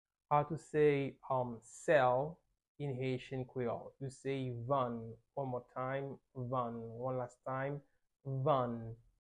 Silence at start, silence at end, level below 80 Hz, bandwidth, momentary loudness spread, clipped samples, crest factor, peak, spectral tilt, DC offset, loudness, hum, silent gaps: 0.3 s; 0.25 s; -70 dBFS; 10.5 kHz; 14 LU; under 0.1%; 20 dB; -18 dBFS; -7 dB/octave; under 0.1%; -38 LUFS; none; 2.68-2.75 s